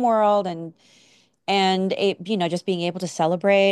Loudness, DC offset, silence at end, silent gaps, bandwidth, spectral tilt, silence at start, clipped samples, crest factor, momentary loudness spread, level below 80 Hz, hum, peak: -22 LUFS; under 0.1%; 0 s; none; 12 kHz; -5 dB/octave; 0 s; under 0.1%; 16 dB; 12 LU; -74 dBFS; none; -6 dBFS